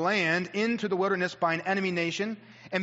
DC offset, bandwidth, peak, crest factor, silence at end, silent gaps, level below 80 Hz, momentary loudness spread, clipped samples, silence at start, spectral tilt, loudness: under 0.1%; 8 kHz; -12 dBFS; 16 dB; 0 s; none; -76 dBFS; 8 LU; under 0.1%; 0 s; -3.5 dB/octave; -28 LUFS